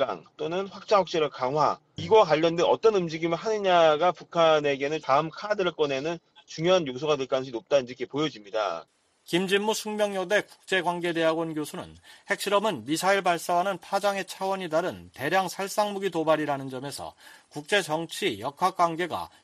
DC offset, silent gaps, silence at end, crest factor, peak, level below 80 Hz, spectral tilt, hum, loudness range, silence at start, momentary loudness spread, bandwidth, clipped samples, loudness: under 0.1%; none; 0.15 s; 18 dB; -8 dBFS; -68 dBFS; -4.5 dB/octave; none; 5 LU; 0 s; 12 LU; 14.5 kHz; under 0.1%; -26 LUFS